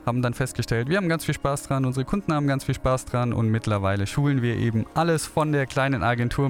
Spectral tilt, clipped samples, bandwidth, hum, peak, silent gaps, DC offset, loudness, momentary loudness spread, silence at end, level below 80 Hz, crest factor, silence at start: -6 dB/octave; under 0.1%; 17 kHz; none; -10 dBFS; none; under 0.1%; -24 LUFS; 3 LU; 0 s; -44 dBFS; 14 dB; 0 s